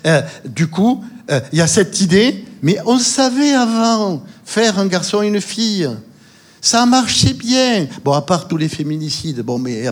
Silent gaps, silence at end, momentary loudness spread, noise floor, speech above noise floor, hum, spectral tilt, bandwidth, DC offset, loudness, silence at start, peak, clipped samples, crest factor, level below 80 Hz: none; 0 s; 9 LU; -45 dBFS; 30 dB; none; -4 dB/octave; 16.5 kHz; under 0.1%; -15 LUFS; 0.05 s; 0 dBFS; under 0.1%; 14 dB; -46 dBFS